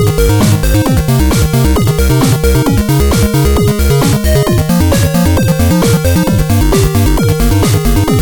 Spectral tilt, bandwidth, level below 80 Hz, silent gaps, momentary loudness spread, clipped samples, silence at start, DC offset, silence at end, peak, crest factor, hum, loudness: -6 dB/octave; 19 kHz; -16 dBFS; none; 1 LU; under 0.1%; 0 s; under 0.1%; 0 s; 0 dBFS; 8 dB; none; -10 LUFS